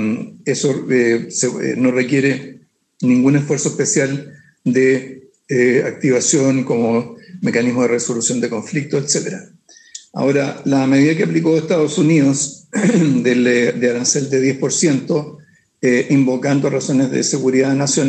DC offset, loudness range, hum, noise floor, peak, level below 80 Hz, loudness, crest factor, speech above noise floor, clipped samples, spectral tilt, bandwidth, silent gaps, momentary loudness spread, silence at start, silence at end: under 0.1%; 3 LU; none; -39 dBFS; -2 dBFS; -68 dBFS; -16 LUFS; 14 dB; 24 dB; under 0.1%; -5 dB/octave; 9.2 kHz; none; 8 LU; 0 s; 0 s